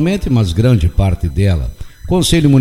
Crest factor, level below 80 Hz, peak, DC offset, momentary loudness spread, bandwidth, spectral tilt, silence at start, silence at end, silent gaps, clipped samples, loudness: 12 dB; -22 dBFS; 0 dBFS; under 0.1%; 8 LU; 15.5 kHz; -6.5 dB/octave; 0 s; 0 s; none; under 0.1%; -14 LUFS